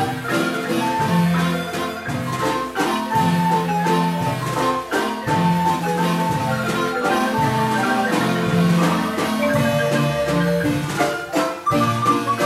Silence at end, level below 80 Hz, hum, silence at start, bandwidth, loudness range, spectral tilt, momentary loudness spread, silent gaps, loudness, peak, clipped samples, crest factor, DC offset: 0 s; -48 dBFS; none; 0 s; 15.5 kHz; 2 LU; -5.5 dB/octave; 4 LU; none; -20 LUFS; -6 dBFS; under 0.1%; 14 dB; under 0.1%